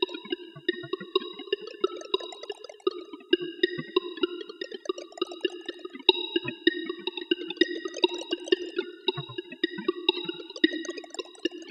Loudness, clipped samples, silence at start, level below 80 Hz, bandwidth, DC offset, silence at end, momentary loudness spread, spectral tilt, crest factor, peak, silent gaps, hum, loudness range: -30 LUFS; under 0.1%; 0 s; -76 dBFS; 9.4 kHz; under 0.1%; 0 s; 11 LU; -3.5 dB/octave; 30 dB; 0 dBFS; none; none; 4 LU